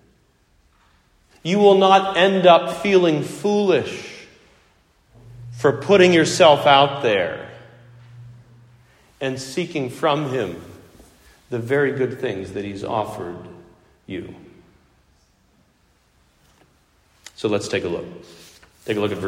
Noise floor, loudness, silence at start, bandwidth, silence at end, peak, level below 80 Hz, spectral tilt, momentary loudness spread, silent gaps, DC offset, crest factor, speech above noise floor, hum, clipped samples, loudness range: -60 dBFS; -18 LUFS; 1.45 s; 15 kHz; 0 s; 0 dBFS; -58 dBFS; -5 dB/octave; 20 LU; none; under 0.1%; 20 dB; 42 dB; none; under 0.1%; 14 LU